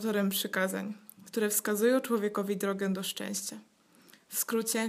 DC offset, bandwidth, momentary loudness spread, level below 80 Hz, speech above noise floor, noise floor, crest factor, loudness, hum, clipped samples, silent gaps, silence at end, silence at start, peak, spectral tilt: under 0.1%; 15.5 kHz; 11 LU; -84 dBFS; 29 dB; -60 dBFS; 18 dB; -31 LUFS; none; under 0.1%; none; 0 s; 0 s; -14 dBFS; -3.5 dB/octave